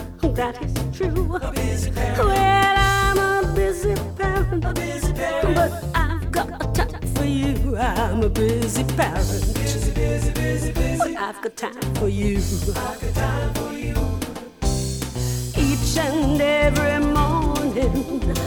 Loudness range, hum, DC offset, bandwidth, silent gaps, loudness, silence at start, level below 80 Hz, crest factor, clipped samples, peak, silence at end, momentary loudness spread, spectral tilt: 5 LU; none; under 0.1%; 20 kHz; none; -22 LUFS; 0 s; -26 dBFS; 16 dB; under 0.1%; -4 dBFS; 0 s; 8 LU; -5.5 dB/octave